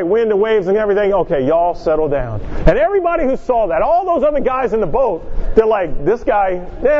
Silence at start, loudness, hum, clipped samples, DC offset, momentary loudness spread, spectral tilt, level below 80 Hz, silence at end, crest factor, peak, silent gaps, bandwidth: 0 s; -15 LUFS; none; under 0.1%; under 0.1%; 4 LU; -8 dB/octave; -26 dBFS; 0 s; 14 dB; 0 dBFS; none; 6.8 kHz